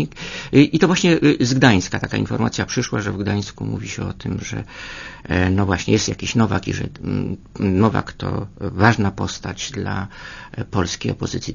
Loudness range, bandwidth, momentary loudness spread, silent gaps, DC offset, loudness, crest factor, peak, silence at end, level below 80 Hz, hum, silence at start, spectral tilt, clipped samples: 6 LU; 7.4 kHz; 14 LU; none; under 0.1%; -20 LUFS; 20 dB; 0 dBFS; 0 s; -42 dBFS; none; 0 s; -5.5 dB/octave; under 0.1%